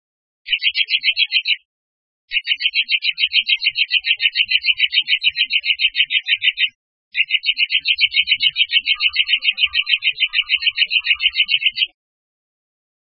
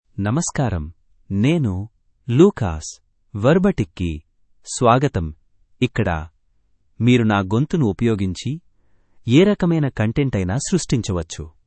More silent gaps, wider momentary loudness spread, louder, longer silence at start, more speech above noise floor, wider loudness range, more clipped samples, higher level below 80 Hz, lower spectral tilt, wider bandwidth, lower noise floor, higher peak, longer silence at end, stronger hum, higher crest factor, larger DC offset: first, 1.65-2.28 s, 6.75-7.11 s vs none; second, 5 LU vs 16 LU; first, -15 LUFS vs -19 LUFS; first, 0.45 s vs 0.15 s; first, over 72 dB vs 44 dB; about the same, 2 LU vs 2 LU; neither; second, -62 dBFS vs -42 dBFS; second, 1 dB/octave vs -6.5 dB/octave; second, 5.8 kHz vs 8.8 kHz; first, under -90 dBFS vs -62 dBFS; about the same, 0 dBFS vs 0 dBFS; first, 1.2 s vs 0.2 s; neither; about the same, 18 dB vs 20 dB; neither